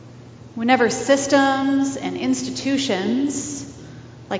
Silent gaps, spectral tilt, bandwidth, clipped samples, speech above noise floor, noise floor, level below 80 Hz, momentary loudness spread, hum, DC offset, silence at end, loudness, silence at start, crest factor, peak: none; -3.5 dB/octave; 8 kHz; under 0.1%; 21 dB; -41 dBFS; -54 dBFS; 20 LU; none; under 0.1%; 0 s; -20 LUFS; 0 s; 22 dB; 0 dBFS